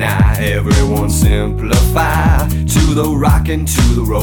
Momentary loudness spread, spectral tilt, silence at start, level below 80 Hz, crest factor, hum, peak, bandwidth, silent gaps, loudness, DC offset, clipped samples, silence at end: 2 LU; -5.5 dB/octave; 0 s; -16 dBFS; 12 dB; none; 0 dBFS; 19.5 kHz; none; -13 LUFS; under 0.1%; under 0.1%; 0 s